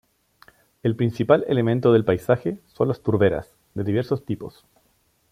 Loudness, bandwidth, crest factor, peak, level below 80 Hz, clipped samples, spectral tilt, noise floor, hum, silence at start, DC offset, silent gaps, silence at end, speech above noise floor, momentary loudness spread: -22 LUFS; 15 kHz; 20 dB; -2 dBFS; -54 dBFS; under 0.1%; -8.5 dB/octave; -65 dBFS; none; 0.85 s; under 0.1%; none; 0.85 s; 44 dB; 13 LU